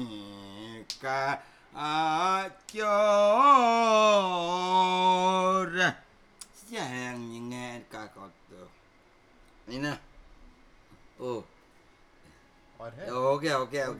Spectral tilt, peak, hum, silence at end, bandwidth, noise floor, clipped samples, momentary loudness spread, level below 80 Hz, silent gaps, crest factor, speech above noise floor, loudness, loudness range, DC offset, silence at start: -4 dB/octave; -8 dBFS; none; 0 s; 14 kHz; -60 dBFS; under 0.1%; 22 LU; -64 dBFS; none; 20 dB; 34 dB; -26 LUFS; 19 LU; under 0.1%; 0 s